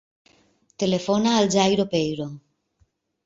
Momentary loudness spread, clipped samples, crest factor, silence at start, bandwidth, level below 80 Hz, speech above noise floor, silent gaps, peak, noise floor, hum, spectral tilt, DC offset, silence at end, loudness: 10 LU; under 0.1%; 20 dB; 0.8 s; 8 kHz; -60 dBFS; 45 dB; none; -4 dBFS; -66 dBFS; none; -5 dB/octave; under 0.1%; 0.9 s; -22 LUFS